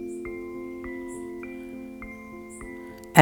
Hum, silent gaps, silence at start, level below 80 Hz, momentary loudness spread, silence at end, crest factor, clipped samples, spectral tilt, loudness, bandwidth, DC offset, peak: none; none; 0 s; -54 dBFS; 5 LU; 0 s; 26 dB; under 0.1%; -5.5 dB/octave; -34 LUFS; 19.5 kHz; under 0.1%; 0 dBFS